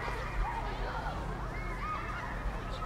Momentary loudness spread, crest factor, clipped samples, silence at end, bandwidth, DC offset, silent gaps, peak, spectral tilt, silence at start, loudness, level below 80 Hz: 3 LU; 14 dB; under 0.1%; 0 s; 13 kHz; under 0.1%; none; -22 dBFS; -6 dB/octave; 0 s; -38 LUFS; -40 dBFS